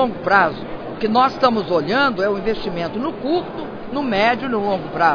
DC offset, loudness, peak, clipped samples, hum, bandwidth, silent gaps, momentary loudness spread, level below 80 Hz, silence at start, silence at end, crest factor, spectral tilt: under 0.1%; -19 LUFS; -2 dBFS; under 0.1%; none; 5.4 kHz; none; 10 LU; -46 dBFS; 0 s; 0 s; 18 dB; -6.5 dB/octave